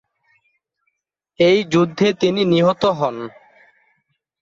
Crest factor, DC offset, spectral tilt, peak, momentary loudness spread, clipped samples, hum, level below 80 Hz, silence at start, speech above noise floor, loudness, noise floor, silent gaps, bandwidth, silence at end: 16 dB; under 0.1%; -6 dB/octave; -2 dBFS; 8 LU; under 0.1%; none; -58 dBFS; 1.4 s; 57 dB; -17 LUFS; -73 dBFS; none; 7.6 kHz; 1.15 s